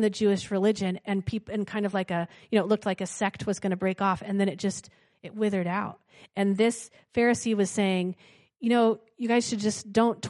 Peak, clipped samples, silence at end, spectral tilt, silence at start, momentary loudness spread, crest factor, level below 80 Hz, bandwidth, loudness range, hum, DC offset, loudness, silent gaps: -10 dBFS; under 0.1%; 0 s; -5.5 dB/octave; 0 s; 8 LU; 18 dB; -64 dBFS; 11.5 kHz; 3 LU; none; under 0.1%; -27 LUFS; none